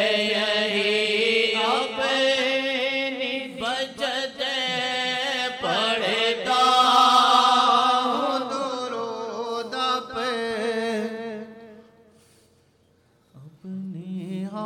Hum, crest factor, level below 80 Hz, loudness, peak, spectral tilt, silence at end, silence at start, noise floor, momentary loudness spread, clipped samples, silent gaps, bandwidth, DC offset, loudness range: none; 20 dB; -68 dBFS; -22 LUFS; -4 dBFS; -3 dB/octave; 0 s; 0 s; -62 dBFS; 15 LU; under 0.1%; none; 16.5 kHz; under 0.1%; 13 LU